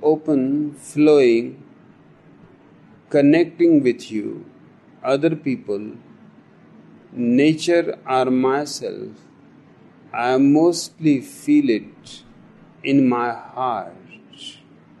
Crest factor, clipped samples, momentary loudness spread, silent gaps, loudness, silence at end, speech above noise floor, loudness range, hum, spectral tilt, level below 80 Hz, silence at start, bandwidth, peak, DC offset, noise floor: 16 dB; under 0.1%; 21 LU; none; -19 LUFS; 0.5 s; 31 dB; 4 LU; none; -6 dB/octave; -68 dBFS; 0 s; 12 kHz; -4 dBFS; under 0.1%; -49 dBFS